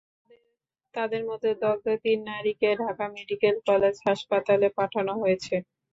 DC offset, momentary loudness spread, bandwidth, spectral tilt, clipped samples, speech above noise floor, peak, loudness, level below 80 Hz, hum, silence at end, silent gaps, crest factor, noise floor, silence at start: under 0.1%; 9 LU; 7.8 kHz; -5.5 dB/octave; under 0.1%; 52 dB; -10 dBFS; -26 LUFS; -66 dBFS; none; 0.3 s; none; 16 dB; -77 dBFS; 0.95 s